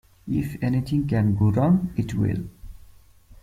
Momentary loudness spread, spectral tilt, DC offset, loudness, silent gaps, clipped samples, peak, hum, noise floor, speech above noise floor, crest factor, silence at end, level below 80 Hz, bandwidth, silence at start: 8 LU; -9 dB/octave; under 0.1%; -23 LUFS; none; under 0.1%; -8 dBFS; none; -50 dBFS; 28 dB; 16 dB; 0.05 s; -44 dBFS; 14.5 kHz; 0.25 s